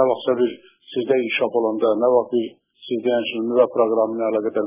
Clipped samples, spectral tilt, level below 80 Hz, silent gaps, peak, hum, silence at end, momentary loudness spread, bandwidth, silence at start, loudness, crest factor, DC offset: under 0.1%; -9 dB/octave; -68 dBFS; none; -4 dBFS; none; 0 s; 10 LU; 3.8 kHz; 0 s; -20 LUFS; 16 dB; under 0.1%